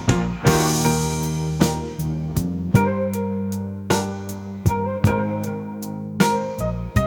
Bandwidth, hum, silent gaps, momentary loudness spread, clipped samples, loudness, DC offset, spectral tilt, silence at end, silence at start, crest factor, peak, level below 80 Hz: 19.5 kHz; none; none; 10 LU; under 0.1%; -22 LUFS; under 0.1%; -5.5 dB/octave; 0 s; 0 s; 20 dB; 0 dBFS; -38 dBFS